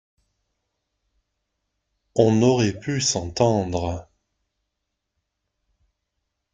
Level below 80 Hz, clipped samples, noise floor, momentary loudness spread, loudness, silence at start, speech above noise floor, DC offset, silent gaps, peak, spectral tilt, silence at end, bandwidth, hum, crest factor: -54 dBFS; under 0.1%; -80 dBFS; 11 LU; -21 LUFS; 2.15 s; 60 dB; under 0.1%; none; -2 dBFS; -5 dB/octave; 2.5 s; 9.6 kHz; none; 24 dB